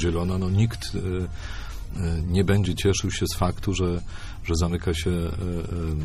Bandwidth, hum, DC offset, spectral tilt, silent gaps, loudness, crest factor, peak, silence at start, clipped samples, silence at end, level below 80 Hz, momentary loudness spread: 14 kHz; none; under 0.1%; -5.5 dB/octave; none; -26 LUFS; 16 dB; -8 dBFS; 0 s; under 0.1%; 0 s; -34 dBFS; 12 LU